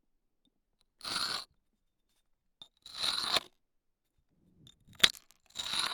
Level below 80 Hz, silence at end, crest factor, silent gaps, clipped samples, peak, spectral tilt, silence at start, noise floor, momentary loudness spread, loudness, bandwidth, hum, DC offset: -68 dBFS; 0 s; 34 dB; none; under 0.1%; -4 dBFS; 0 dB/octave; 1.05 s; -79 dBFS; 19 LU; -31 LUFS; 18 kHz; none; under 0.1%